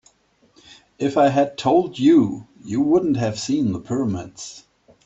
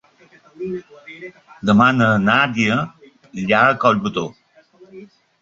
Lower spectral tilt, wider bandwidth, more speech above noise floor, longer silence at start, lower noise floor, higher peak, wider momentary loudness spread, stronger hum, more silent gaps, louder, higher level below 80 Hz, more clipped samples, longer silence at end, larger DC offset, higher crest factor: about the same, -6.5 dB/octave vs -6 dB/octave; about the same, 8.2 kHz vs 7.8 kHz; first, 40 dB vs 34 dB; first, 1 s vs 0.6 s; first, -59 dBFS vs -51 dBFS; second, -6 dBFS vs -2 dBFS; second, 15 LU vs 22 LU; neither; neither; second, -20 LUFS vs -17 LUFS; about the same, -58 dBFS vs -54 dBFS; neither; about the same, 0.45 s vs 0.35 s; neither; about the same, 16 dB vs 18 dB